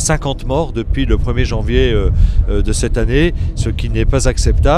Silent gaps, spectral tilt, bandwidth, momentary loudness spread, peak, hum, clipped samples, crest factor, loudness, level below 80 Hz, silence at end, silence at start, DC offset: none; -5.5 dB/octave; 12 kHz; 4 LU; 0 dBFS; none; under 0.1%; 12 dB; -16 LUFS; -16 dBFS; 0 s; 0 s; under 0.1%